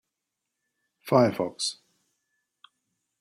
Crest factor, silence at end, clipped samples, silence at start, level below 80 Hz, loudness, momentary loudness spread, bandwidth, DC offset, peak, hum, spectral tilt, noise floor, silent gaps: 22 dB; 1.5 s; under 0.1%; 1.05 s; -72 dBFS; -25 LUFS; 24 LU; 16 kHz; under 0.1%; -8 dBFS; none; -5 dB/octave; -84 dBFS; none